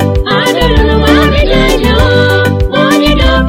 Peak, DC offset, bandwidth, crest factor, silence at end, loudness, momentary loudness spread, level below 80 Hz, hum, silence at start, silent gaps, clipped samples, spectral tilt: 0 dBFS; under 0.1%; 16.5 kHz; 8 dB; 0 s; -8 LUFS; 3 LU; -14 dBFS; none; 0 s; none; 0.9%; -5.5 dB/octave